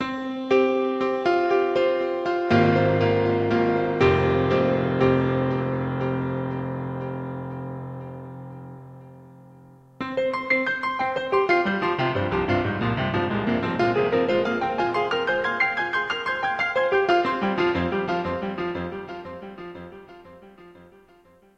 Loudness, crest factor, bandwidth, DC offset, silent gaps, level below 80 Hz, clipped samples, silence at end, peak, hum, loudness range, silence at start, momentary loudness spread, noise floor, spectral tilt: -23 LUFS; 18 dB; 8 kHz; under 0.1%; none; -50 dBFS; under 0.1%; 0.7 s; -6 dBFS; none; 11 LU; 0 s; 15 LU; -55 dBFS; -7.5 dB/octave